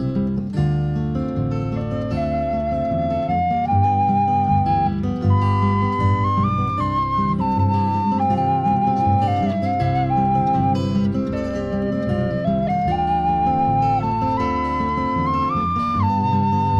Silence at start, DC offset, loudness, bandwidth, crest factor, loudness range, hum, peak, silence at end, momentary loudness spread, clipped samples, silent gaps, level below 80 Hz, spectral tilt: 0 s; under 0.1%; -20 LUFS; 7 kHz; 12 dB; 2 LU; none; -6 dBFS; 0 s; 5 LU; under 0.1%; none; -38 dBFS; -9 dB/octave